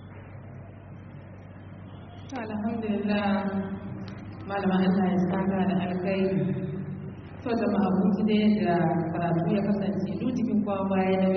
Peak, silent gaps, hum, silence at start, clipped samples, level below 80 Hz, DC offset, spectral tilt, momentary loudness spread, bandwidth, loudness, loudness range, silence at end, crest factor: -14 dBFS; none; none; 0 s; under 0.1%; -58 dBFS; under 0.1%; -7 dB/octave; 20 LU; 6.2 kHz; -27 LUFS; 6 LU; 0 s; 14 dB